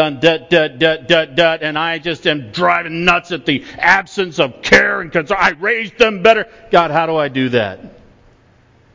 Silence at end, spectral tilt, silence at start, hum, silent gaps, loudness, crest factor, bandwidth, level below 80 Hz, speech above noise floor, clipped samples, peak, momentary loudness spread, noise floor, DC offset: 1.05 s; -4.5 dB/octave; 0 s; none; none; -14 LUFS; 16 dB; 7.6 kHz; -46 dBFS; 35 dB; under 0.1%; 0 dBFS; 8 LU; -50 dBFS; under 0.1%